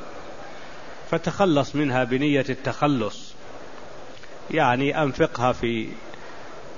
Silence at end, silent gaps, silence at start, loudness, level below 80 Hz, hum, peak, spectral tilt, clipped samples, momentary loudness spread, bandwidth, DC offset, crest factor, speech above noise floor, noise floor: 0 s; none; 0 s; -23 LUFS; -52 dBFS; none; -4 dBFS; -6 dB/octave; under 0.1%; 21 LU; 7.4 kHz; 2%; 20 dB; 19 dB; -42 dBFS